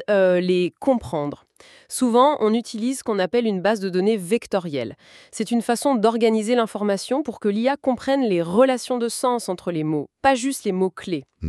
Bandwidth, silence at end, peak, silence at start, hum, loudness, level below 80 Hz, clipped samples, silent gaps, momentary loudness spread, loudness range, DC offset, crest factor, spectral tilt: 13.5 kHz; 0 s; -4 dBFS; 0 s; none; -21 LUFS; -56 dBFS; under 0.1%; none; 9 LU; 1 LU; under 0.1%; 18 dB; -5 dB/octave